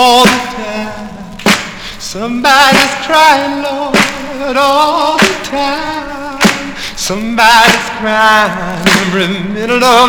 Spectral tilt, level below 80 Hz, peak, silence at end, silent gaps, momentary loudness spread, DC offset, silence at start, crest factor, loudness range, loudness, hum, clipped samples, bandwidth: -3 dB/octave; -36 dBFS; 0 dBFS; 0 s; none; 14 LU; under 0.1%; 0 s; 10 dB; 3 LU; -10 LUFS; none; 1%; over 20 kHz